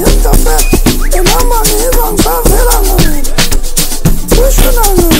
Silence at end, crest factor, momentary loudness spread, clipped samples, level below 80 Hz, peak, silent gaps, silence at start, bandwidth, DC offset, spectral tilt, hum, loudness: 0 s; 6 dB; 3 LU; 0.4%; -8 dBFS; 0 dBFS; none; 0 s; 16.5 kHz; under 0.1%; -4 dB/octave; none; -10 LUFS